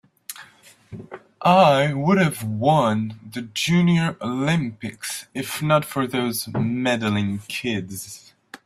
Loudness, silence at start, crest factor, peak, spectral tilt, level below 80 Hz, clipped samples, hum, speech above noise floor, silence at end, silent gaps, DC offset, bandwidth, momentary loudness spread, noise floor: -21 LUFS; 0.3 s; 20 dB; -2 dBFS; -5.5 dB/octave; -58 dBFS; under 0.1%; none; 30 dB; 0.1 s; none; under 0.1%; 15.5 kHz; 20 LU; -51 dBFS